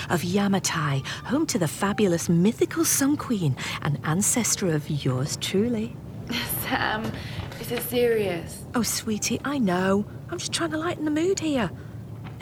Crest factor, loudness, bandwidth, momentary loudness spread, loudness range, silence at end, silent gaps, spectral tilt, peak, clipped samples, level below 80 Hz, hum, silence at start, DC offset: 16 dB; -25 LUFS; over 20 kHz; 10 LU; 4 LU; 0 s; none; -4.5 dB/octave; -8 dBFS; under 0.1%; -52 dBFS; none; 0 s; under 0.1%